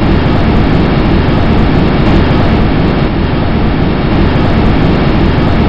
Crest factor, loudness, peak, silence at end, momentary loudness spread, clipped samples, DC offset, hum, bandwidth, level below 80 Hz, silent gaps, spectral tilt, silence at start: 8 dB; -10 LUFS; 0 dBFS; 0 s; 3 LU; under 0.1%; under 0.1%; none; 7 kHz; -14 dBFS; none; -9 dB/octave; 0 s